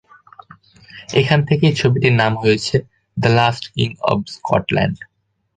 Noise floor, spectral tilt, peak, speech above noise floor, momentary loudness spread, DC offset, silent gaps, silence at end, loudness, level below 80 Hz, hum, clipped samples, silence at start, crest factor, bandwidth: -46 dBFS; -6 dB/octave; 0 dBFS; 29 dB; 8 LU; under 0.1%; none; 0.5 s; -17 LUFS; -46 dBFS; none; under 0.1%; 0.95 s; 18 dB; 9.4 kHz